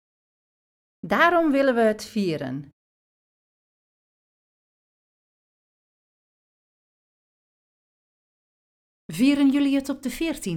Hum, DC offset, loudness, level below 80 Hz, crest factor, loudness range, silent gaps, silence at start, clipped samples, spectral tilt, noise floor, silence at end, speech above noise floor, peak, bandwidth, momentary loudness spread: none; under 0.1%; -22 LUFS; -58 dBFS; 22 dB; 12 LU; 2.73-9.09 s; 1.05 s; under 0.1%; -5 dB/octave; under -90 dBFS; 0 s; over 68 dB; -6 dBFS; 17 kHz; 14 LU